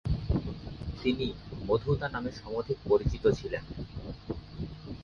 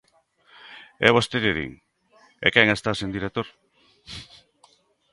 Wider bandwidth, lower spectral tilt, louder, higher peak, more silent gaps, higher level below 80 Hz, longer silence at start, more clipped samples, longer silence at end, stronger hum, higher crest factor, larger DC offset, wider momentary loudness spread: second, 7 kHz vs 11.5 kHz; first, -7.5 dB/octave vs -4.5 dB/octave; second, -33 LUFS vs -22 LUFS; second, -12 dBFS vs 0 dBFS; neither; first, -42 dBFS vs -52 dBFS; second, 0.05 s vs 0.65 s; neither; second, 0 s vs 0.9 s; neither; second, 20 dB vs 26 dB; neither; second, 13 LU vs 22 LU